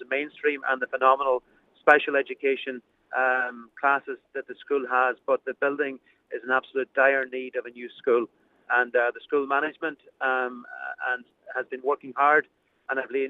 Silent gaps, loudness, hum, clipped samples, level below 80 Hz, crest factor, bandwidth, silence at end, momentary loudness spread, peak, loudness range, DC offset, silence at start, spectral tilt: none; -25 LUFS; none; under 0.1%; -78 dBFS; 24 dB; 7 kHz; 0 s; 15 LU; -2 dBFS; 3 LU; under 0.1%; 0 s; -5 dB/octave